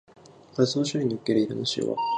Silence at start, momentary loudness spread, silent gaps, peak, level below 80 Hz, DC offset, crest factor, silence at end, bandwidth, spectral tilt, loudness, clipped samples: 0.55 s; 3 LU; none; -8 dBFS; -68 dBFS; under 0.1%; 18 dB; 0 s; 10 kHz; -5.5 dB/octave; -26 LUFS; under 0.1%